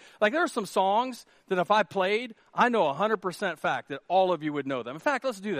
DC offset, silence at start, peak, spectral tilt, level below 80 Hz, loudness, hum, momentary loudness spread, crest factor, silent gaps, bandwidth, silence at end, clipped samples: under 0.1%; 0.2 s; -8 dBFS; -4.5 dB/octave; -78 dBFS; -27 LUFS; none; 8 LU; 20 dB; none; 15 kHz; 0 s; under 0.1%